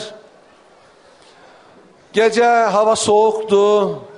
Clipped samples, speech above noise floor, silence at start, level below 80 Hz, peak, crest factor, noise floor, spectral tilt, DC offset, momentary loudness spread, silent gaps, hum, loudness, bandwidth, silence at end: under 0.1%; 34 dB; 0 s; -62 dBFS; -2 dBFS; 14 dB; -48 dBFS; -3.5 dB/octave; under 0.1%; 4 LU; none; none; -14 LUFS; 10.5 kHz; 0.05 s